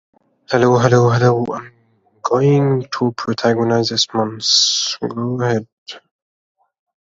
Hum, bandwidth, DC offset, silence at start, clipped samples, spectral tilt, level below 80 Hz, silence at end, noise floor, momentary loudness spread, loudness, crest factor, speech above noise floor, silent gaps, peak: none; 7.8 kHz; under 0.1%; 0.5 s; under 0.1%; -4.5 dB/octave; -56 dBFS; 1.05 s; -57 dBFS; 12 LU; -16 LUFS; 18 dB; 42 dB; 5.72-5.86 s; 0 dBFS